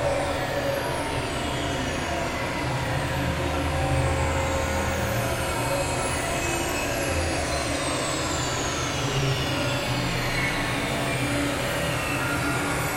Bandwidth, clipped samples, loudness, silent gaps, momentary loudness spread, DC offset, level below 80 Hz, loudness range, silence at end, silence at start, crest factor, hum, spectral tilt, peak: 16 kHz; under 0.1%; -26 LUFS; none; 3 LU; under 0.1%; -38 dBFS; 1 LU; 0 s; 0 s; 14 dB; none; -4 dB/octave; -12 dBFS